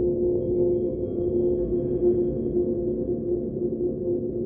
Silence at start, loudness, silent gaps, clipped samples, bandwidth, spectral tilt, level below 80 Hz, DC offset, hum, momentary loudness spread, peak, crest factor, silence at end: 0 s; -25 LUFS; none; under 0.1%; 1.2 kHz; -15 dB/octave; -42 dBFS; under 0.1%; none; 4 LU; -12 dBFS; 12 dB; 0 s